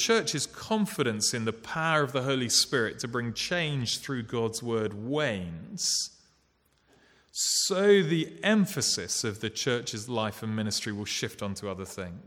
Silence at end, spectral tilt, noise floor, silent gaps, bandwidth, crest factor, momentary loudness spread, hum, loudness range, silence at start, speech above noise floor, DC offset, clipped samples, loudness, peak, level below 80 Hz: 0 s; -3.5 dB/octave; -69 dBFS; none; 18.5 kHz; 20 dB; 10 LU; none; 5 LU; 0 s; 40 dB; under 0.1%; under 0.1%; -28 LUFS; -10 dBFS; -64 dBFS